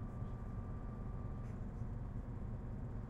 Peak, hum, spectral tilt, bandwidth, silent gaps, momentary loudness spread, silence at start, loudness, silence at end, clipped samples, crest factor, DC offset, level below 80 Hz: -32 dBFS; none; -10 dB/octave; 7.8 kHz; none; 1 LU; 0 s; -47 LUFS; 0 s; under 0.1%; 12 dB; under 0.1%; -48 dBFS